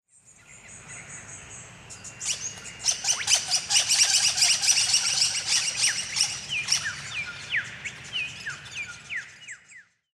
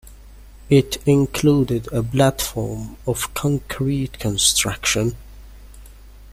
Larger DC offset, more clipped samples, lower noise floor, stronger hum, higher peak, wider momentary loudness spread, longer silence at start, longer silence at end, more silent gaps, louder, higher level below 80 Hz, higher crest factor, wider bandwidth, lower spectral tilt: neither; neither; first, -54 dBFS vs -42 dBFS; neither; second, -6 dBFS vs -2 dBFS; first, 22 LU vs 10 LU; first, 0.5 s vs 0.05 s; first, 0.3 s vs 0 s; neither; second, -23 LUFS vs -19 LUFS; second, -62 dBFS vs -38 dBFS; about the same, 22 dB vs 20 dB; about the same, 16 kHz vs 16 kHz; second, 2 dB/octave vs -4.5 dB/octave